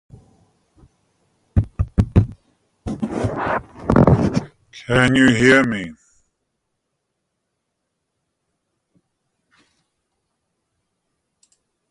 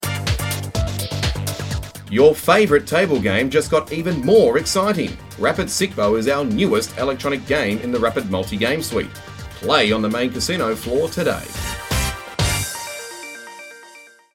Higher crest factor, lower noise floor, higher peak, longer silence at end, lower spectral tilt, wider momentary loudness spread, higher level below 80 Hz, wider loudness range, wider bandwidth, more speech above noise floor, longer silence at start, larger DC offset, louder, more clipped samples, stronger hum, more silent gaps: about the same, 22 dB vs 20 dB; first, -76 dBFS vs -45 dBFS; about the same, 0 dBFS vs 0 dBFS; first, 5.95 s vs 0.3 s; first, -6.5 dB/octave vs -4.5 dB/octave; first, 17 LU vs 14 LU; about the same, -34 dBFS vs -36 dBFS; about the same, 7 LU vs 6 LU; second, 11.5 kHz vs 17 kHz; first, 61 dB vs 27 dB; first, 1.55 s vs 0 s; neither; about the same, -18 LUFS vs -19 LUFS; neither; neither; neither